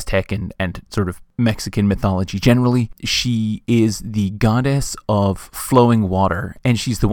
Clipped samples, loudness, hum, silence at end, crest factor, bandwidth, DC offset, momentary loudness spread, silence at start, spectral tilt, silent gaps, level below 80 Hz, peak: under 0.1%; -18 LUFS; none; 0 s; 18 dB; 19 kHz; under 0.1%; 8 LU; 0 s; -6 dB/octave; none; -34 dBFS; 0 dBFS